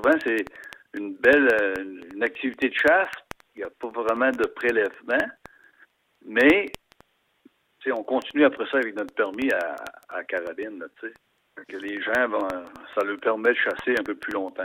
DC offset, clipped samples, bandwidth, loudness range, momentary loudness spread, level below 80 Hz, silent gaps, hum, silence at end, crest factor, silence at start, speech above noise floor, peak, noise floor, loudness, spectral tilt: under 0.1%; under 0.1%; 16.5 kHz; 6 LU; 18 LU; -62 dBFS; none; none; 0 s; 20 dB; 0 s; 38 dB; -4 dBFS; -62 dBFS; -24 LUFS; -4.5 dB/octave